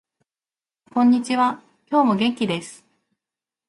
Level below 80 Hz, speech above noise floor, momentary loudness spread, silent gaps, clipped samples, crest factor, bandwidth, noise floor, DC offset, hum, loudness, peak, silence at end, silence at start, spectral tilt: -68 dBFS; over 71 dB; 11 LU; none; under 0.1%; 16 dB; 11.5 kHz; under -90 dBFS; under 0.1%; none; -20 LUFS; -6 dBFS; 0.95 s; 0.95 s; -5.5 dB/octave